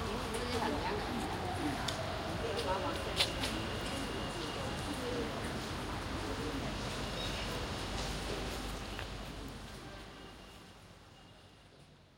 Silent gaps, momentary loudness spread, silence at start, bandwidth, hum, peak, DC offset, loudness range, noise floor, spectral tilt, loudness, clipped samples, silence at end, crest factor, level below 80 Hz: none; 17 LU; 0 s; 16 kHz; none; -14 dBFS; under 0.1%; 8 LU; -60 dBFS; -4 dB/octave; -38 LUFS; under 0.1%; 0 s; 24 dB; -48 dBFS